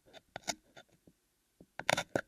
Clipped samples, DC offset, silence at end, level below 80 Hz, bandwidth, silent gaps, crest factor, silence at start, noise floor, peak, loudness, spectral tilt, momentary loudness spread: under 0.1%; under 0.1%; 0.05 s; -70 dBFS; 15.5 kHz; none; 34 dB; 0.15 s; -76 dBFS; -8 dBFS; -37 LUFS; -2.5 dB/octave; 24 LU